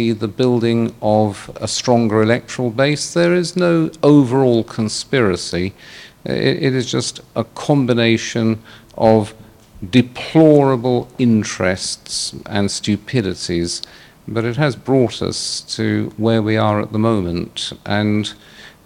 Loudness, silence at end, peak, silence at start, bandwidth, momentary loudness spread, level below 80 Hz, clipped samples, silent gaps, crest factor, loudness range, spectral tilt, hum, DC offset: -17 LUFS; 0.15 s; 0 dBFS; 0 s; 15.5 kHz; 10 LU; -50 dBFS; under 0.1%; none; 16 dB; 4 LU; -5.5 dB/octave; none; under 0.1%